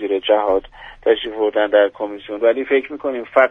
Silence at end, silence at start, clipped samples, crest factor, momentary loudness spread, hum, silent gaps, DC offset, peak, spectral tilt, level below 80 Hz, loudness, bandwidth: 0 s; 0 s; under 0.1%; 16 dB; 9 LU; none; none; under 0.1%; 0 dBFS; -5.5 dB/octave; -50 dBFS; -18 LUFS; 3.9 kHz